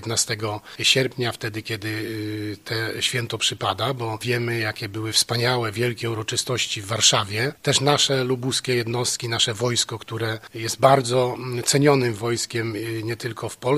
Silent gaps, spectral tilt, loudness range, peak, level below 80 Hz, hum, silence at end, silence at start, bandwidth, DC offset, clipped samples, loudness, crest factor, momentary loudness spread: none; -3.5 dB/octave; 4 LU; 0 dBFS; -60 dBFS; none; 0 s; 0 s; 15.5 kHz; under 0.1%; under 0.1%; -22 LUFS; 22 dB; 11 LU